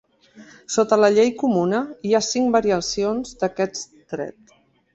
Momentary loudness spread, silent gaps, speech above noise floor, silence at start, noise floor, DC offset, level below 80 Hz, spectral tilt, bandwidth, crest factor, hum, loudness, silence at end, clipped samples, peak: 15 LU; none; 28 dB; 0.35 s; -48 dBFS; under 0.1%; -56 dBFS; -4.5 dB/octave; 8.2 kHz; 18 dB; none; -20 LUFS; 0.65 s; under 0.1%; -2 dBFS